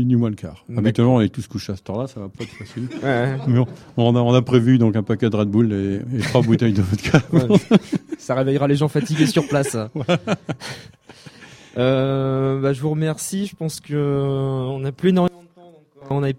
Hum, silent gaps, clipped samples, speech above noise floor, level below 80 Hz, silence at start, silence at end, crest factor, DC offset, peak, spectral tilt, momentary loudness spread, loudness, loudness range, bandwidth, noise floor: none; none; under 0.1%; 29 dB; -52 dBFS; 0 s; 0 s; 18 dB; under 0.1%; 0 dBFS; -7 dB/octave; 13 LU; -19 LUFS; 5 LU; 15 kHz; -48 dBFS